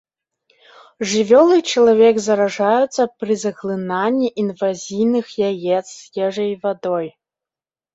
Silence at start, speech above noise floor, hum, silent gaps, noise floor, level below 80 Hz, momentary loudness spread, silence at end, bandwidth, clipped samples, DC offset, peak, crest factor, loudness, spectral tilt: 1 s; over 73 dB; none; none; under -90 dBFS; -64 dBFS; 11 LU; 0.85 s; 8 kHz; under 0.1%; under 0.1%; -2 dBFS; 16 dB; -17 LUFS; -4.5 dB/octave